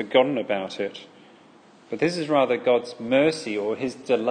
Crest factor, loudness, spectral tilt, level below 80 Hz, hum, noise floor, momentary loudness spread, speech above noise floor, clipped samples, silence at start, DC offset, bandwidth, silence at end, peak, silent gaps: 20 dB; -24 LUFS; -5 dB/octave; -70 dBFS; none; -52 dBFS; 10 LU; 29 dB; under 0.1%; 0 s; under 0.1%; 9.8 kHz; 0 s; -4 dBFS; none